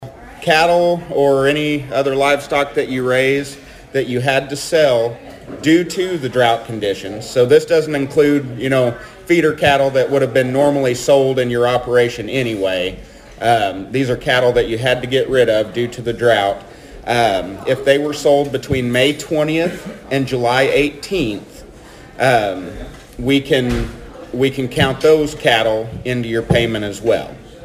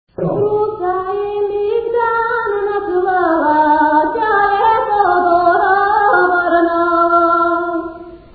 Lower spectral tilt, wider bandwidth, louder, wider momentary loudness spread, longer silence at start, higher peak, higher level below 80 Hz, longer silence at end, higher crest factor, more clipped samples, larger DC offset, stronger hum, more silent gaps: second, -5 dB/octave vs -11 dB/octave; first, 15.5 kHz vs 4.8 kHz; about the same, -16 LUFS vs -14 LUFS; about the same, 9 LU vs 7 LU; second, 0 s vs 0.2 s; about the same, 0 dBFS vs 0 dBFS; first, -40 dBFS vs -46 dBFS; second, 0 s vs 0.15 s; about the same, 16 dB vs 14 dB; neither; neither; neither; neither